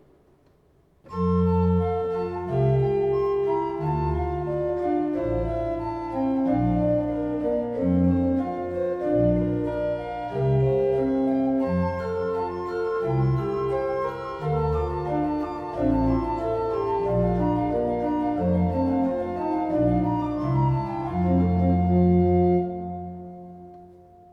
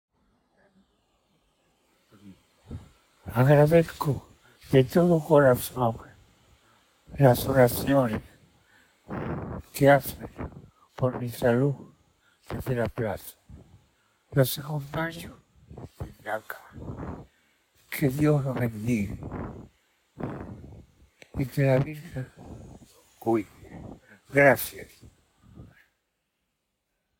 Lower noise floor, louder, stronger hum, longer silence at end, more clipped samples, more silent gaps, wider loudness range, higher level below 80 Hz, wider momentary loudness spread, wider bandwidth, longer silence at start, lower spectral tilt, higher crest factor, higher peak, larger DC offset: second, -60 dBFS vs -79 dBFS; about the same, -24 LUFS vs -25 LUFS; neither; second, 0.4 s vs 1.55 s; neither; neither; second, 3 LU vs 9 LU; first, -40 dBFS vs -52 dBFS; second, 7 LU vs 24 LU; second, 5.6 kHz vs over 20 kHz; second, 1.05 s vs 2.25 s; first, -10.5 dB/octave vs -6.5 dB/octave; second, 14 dB vs 22 dB; second, -10 dBFS vs -6 dBFS; neither